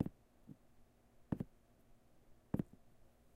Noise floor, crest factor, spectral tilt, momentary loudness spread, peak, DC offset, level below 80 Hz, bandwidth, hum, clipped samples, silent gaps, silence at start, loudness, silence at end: -67 dBFS; 26 dB; -9.5 dB/octave; 20 LU; -22 dBFS; under 0.1%; -66 dBFS; 15.5 kHz; none; under 0.1%; none; 0 s; -47 LUFS; 0.5 s